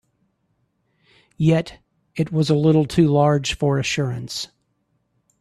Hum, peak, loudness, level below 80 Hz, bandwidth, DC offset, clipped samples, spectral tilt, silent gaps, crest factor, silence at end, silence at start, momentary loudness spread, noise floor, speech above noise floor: none; -4 dBFS; -20 LUFS; -48 dBFS; 12.5 kHz; under 0.1%; under 0.1%; -6.5 dB/octave; none; 16 dB; 0.95 s; 1.4 s; 13 LU; -69 dBFS; 51 dB